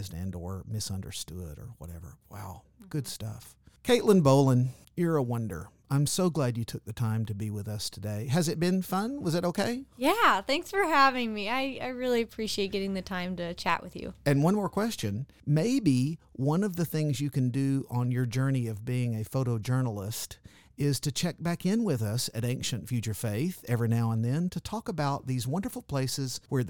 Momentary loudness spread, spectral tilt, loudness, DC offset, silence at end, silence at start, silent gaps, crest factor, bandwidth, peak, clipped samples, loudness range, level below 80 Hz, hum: 13 LU; -5.5 dB/octave; -29 LUFS; 0.1%; 0 s; 0 s; none; 20 dB; 19 kHz; -10 dBFS; under 0.1%; 4 LU; -56 dBFS; none